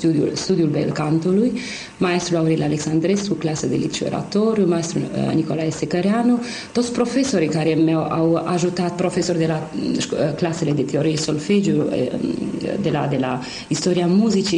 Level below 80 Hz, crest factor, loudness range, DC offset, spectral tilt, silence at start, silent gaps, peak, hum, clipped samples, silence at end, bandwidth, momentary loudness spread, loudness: -52 dBFS; 12 dB; 1 LU; under 0.1%; -6 dB/octave; 0 s; none; -6 dBFS; none; under 0.1%; 0 s; 11 kHz; 5 LU; -20 LUFS